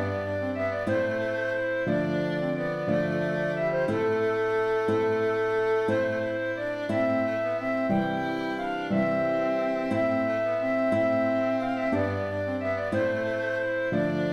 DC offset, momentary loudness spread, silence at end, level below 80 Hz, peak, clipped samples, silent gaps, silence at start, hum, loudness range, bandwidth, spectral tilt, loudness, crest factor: under 0.1%; 4 LU; 0 s; -60 dBFS; -14 dBFS; under 0.1%; none; 0 s; none; 2 LU; 12.5 kHz; -7.5 dB/octave; -27 LUFS; 12 dB